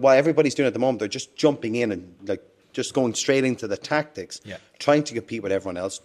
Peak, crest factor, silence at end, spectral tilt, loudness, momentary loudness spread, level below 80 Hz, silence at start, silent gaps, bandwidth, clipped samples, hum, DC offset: -4 dBFS; 20 dB; 0.05 s; -4.5 dB/octave; -24 LUFS; 13 LU; -66 dBFS; 0 s; none; 13 kHz; under 0.1%; none; under 0.1%